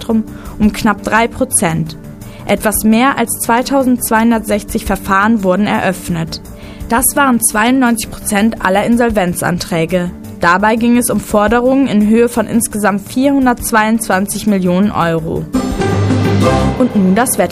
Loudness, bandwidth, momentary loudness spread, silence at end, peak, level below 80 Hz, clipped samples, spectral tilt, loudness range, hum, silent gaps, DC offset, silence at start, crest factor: -13 LUFS; 15.5 kHz; 7 LU; 0 s; 0 dBFS; -32 dBFS; under 0.1%; -5 dB/octave; 2 LU; none; none; under 0.1%; 0 s; 12 dB